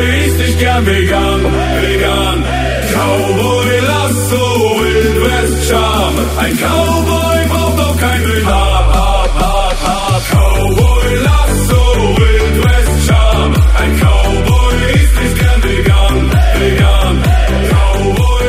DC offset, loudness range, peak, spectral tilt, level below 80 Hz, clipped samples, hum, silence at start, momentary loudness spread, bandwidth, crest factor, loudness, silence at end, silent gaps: under 0.1%; 2 LU; 0 dBFS; -5 dB/octave; -14 dBFS; under 0.1%; none; 0 s; 3 LU; 16 kHz; 10 dB; -11 LUFS; 0 s; none